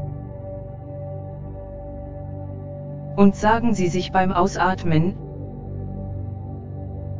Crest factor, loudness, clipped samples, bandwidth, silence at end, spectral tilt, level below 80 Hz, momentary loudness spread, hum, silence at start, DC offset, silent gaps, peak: 22 dB; -24 LUFS; under 0.1%; 7.6 kHz; 0 s; -7 dB/octave; -38 dBFS; 16 LU; none; 0 s; under 0.1%; none; -2 dBFS